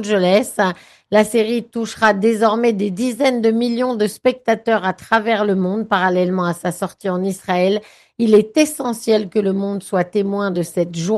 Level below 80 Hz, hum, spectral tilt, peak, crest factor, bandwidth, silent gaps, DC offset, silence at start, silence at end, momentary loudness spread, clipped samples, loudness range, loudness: -62 dBFS; none; -5.5 dB/octave; -2 dBFS; 16 dB; 12.5 kHz; none; under 0.1%; 0 s; 0 s; 7 LU; under 0.1%; 1 LU; -18 LUFS